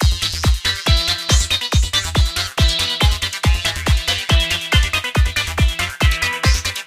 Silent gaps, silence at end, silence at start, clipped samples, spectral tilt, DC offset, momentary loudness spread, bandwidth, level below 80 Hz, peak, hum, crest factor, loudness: none; 0 s; 0 s; under 0.1%; -3 dB/octave; under 0.1%; 2 LU; 16 kHz; -20 dBFS; -2 dBFS; none; 16 dB; -17 LUFS